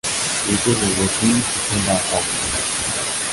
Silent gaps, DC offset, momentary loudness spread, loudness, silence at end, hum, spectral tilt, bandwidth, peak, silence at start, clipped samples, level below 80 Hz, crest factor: none; under 0.1%; 3 LU; -18 LUFS; 0 s; none; -2.5 dB/octave; 12 kHz; -4 dBFS; 0.05 s; under 0.1%; -40 dBFS; 16 dB